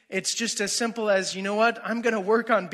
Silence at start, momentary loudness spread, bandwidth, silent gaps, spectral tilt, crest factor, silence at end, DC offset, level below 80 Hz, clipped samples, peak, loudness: 0.1 s; 4 LU; 15 kHz; none; -2.5 dB/octave; 16 dB; 0 s; under 0.1%; -78 dBFS; under 0.1%; -8 dBFS; -25 LUFS